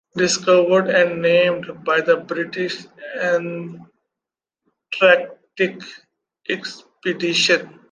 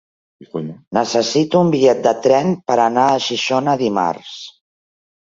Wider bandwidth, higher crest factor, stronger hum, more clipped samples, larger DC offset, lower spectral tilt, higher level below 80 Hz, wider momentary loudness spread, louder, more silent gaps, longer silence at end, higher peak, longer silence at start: first, 9.8 kHz vs 7.8 kHz; about the same, 18 dB vs 16 dB; neither; neither; neither; second, -3.5 dB/octave vs -5 dB/octave; second, -70 dBFS vs -60 dBFS; first, 17 LU vs 14 LU; about the same, -18 LUFS vs -16 LUFS; second, none vs 0.87-0.91 s; second, 0.25 s vs 0.8 s; about the same, -2 dBFS vs -2 dBFS; second, 0.15 s vs 0.4 s